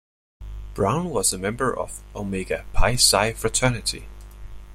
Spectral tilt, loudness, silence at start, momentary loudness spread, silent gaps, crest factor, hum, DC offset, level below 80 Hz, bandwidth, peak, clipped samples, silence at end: -3 dB/octave; -22 LUFS; 0.4 s; 17 LU; none; 20 dB; 50 Hz at -40 dBFS; under 0.1%; -32 dBFS; 15.5 kHz; -4 dBFS; under 0.1%; 0 s